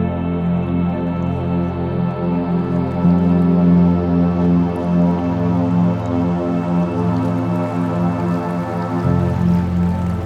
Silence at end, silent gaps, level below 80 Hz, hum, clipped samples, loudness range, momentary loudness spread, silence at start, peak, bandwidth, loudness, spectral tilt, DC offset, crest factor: 0 s; none; -38 dBFS; none; under 0.1%; 3 LU; 6 LU; 0 s; -4 dBFS; 5.2 kHz; -18 LUFS; -10 dB/octave; under 0.1%; 12 dB